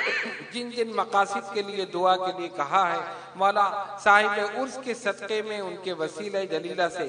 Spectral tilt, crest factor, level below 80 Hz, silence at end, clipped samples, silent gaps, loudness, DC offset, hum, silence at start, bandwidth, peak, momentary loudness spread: -3.5 dB/octave; 22 dB; -76 dBFS; 0 s; under 0.1%; none; -26 LUFS; under 0.1%; none; 0 s; 10.5 kHz; -4 dBFS; 11 LU